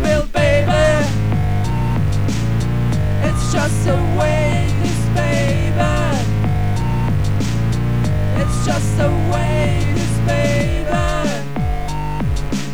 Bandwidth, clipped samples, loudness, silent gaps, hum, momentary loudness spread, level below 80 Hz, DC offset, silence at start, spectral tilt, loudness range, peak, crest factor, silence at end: 15.5 kHz; under 0.1%; -18 LUFS; none; none; 5 LU; -24 dBFS; 6%; 0 s; -6.5 dB/octave; 1 LU; -2 dBFS; 14 dB; 0 s